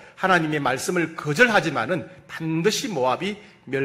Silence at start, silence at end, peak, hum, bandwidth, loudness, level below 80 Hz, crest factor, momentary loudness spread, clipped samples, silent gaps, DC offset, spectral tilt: 0 s; 0 s; -2 dBFS; none; 16 kHz; -22 LUFS; -60 dBFS; 20 dB; 13 LU; under 0.1%; none; under 0.1%; -4.5 dB/octave